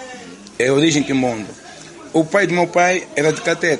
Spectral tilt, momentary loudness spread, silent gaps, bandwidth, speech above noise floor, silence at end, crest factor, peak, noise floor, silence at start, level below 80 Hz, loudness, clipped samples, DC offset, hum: -4.5 dB/octave; 20 LU; none; 11.5 kHz; 21 dB; 0 s; 16 dB; -2 dBFS; -37 dBFS; 0 s; -56 dBFS; -17 LUFS; under 0.1%; under 0.1%; none